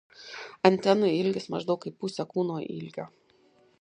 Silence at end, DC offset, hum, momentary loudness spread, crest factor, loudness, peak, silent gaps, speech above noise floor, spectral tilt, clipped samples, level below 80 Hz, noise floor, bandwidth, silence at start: 0.75 s; under 0.1%; none; 18 LU; 24 dB; -27 LUFS; -4 dBFS; none; 36 dB; -6.5 dB/octave; under 0.1%; -74 dBFS; -63 dBFS; 10 kHz; 0.2 s